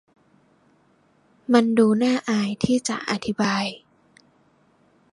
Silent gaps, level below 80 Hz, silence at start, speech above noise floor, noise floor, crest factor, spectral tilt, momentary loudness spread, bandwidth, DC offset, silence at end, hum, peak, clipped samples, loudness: none; -60 dBFS; 1.5 s; 40 dB; -61 dBFS; 20 dB; -5 dB/octave; 10 LU; 11 kHz; under 0.1%; 1.35 s; none; -4 dBFS; under 0.1%; -22 LUFS